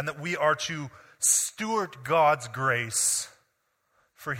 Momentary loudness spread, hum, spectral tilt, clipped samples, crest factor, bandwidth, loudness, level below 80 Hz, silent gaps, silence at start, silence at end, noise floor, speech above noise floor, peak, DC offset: 13 LU; none; -2 dB/octave; under 0.1%; 20 dB; 16.5 kHz; -25 LUFS; -68 dBFS; none; 0 s; 0 s; -74 dBFS; 47 dB; -8 dBFS; under 0.1%